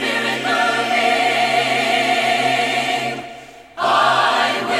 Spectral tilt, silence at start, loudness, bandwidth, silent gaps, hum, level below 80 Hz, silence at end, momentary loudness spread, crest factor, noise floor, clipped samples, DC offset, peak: -2.5 dB/octave; 0 s; -16 LUFS; 15.5 kHz; none; none; -60 dBFS; 0 s; 8 LU; 14 dB; -38 dBFS; under 0.1%; under 0.1%; -4 dBFS